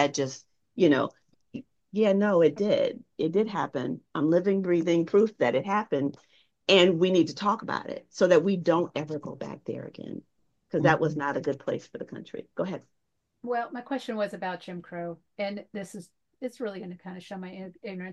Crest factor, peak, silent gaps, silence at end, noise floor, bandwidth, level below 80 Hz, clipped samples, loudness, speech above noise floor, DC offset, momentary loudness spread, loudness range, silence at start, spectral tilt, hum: 22 dB; -6 dBFS; none; 0 s; -79 dBFS; 10 kHz; -72 dBFS; under 0.1%; -27 LUFS; 52 dB; under 0.1%; 18 LU; 10 LU; 0 s; -5.5 dB/octave; none